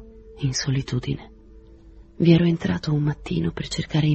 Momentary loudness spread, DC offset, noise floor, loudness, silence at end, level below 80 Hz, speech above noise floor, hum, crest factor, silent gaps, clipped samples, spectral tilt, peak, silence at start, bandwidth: 11 LU; under 0.1%; -47 dBFS; -23 LUFS; 0 s; -44 dBFS; 25 dB; none; 20 dB; none; under 0.1%; -6 dB/octave; -4 dBFS; 0 s; 8.4 kHz